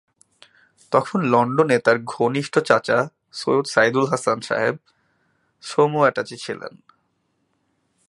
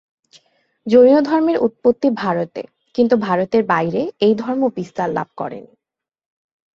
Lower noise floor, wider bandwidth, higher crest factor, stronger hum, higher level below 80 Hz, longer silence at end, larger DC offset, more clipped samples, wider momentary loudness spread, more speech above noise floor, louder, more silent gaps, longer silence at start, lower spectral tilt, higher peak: second, -70 dBFS vs -85 dBFS; first, 11.5 kHz vs 7.2 kHz; first, 22 dB vs 16 dB; neither; second, -68 dBFS vs -60 dBFS; first, 1.4 s vs 1.15 s; neither; neither; about the same, 13 LU vs 15 LU; second, 50 dB vs 69 dB; second, -20 LUFS vs -17 LUFS; neither; about the same, 0.9 s vs 0.85 s; second, -5.5 dB/octave vs -7.5 dB/octave; about the same, 0 dBFS vs -2 dBFS